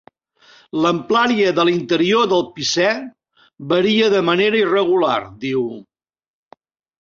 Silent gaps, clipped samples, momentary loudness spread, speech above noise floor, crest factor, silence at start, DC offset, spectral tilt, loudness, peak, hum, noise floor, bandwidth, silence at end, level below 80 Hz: none; under 0.1%; 11 LU; 35 dB; 16 dB; 0.75 s; under 0.1%; -4.5 dB/octave; -17 LUFS; -2 dBFS; none; -52 dBFS; 7.6 kHz; 1.2 s; -60 dBFS